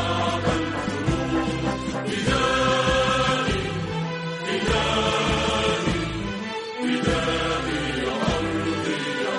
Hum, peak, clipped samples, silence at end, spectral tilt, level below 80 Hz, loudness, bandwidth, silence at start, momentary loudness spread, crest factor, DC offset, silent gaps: none; -8 dBFS; under 0.1%; 0 s; -4.5 dB/octave; -38 dBFS; -24 LUFS; 11.5 kHz; 0 s; 8 LU; 14 dB; under 0.1%; none